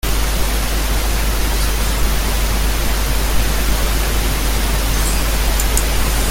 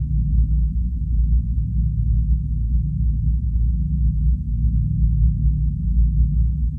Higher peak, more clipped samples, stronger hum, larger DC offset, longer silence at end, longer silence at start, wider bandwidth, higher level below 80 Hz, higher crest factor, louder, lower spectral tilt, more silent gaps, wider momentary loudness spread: first, -2 dBFS vs -8 dBFS; neither; neither; neither; about the same, 0 s vs 0 s; about the same, 0.05 s vs 0 s; first, 17 kHz vs 0.4 kHz; about the same, -18 dBFS vs -20 dBFS; about the same, 14 dB vs 12 dB; first, -18 LUFS vs -21 LUFS; second, -3.5 dB/octave vs -13.5 dB/octave; neither; about the same, 2 LU vs 3 LU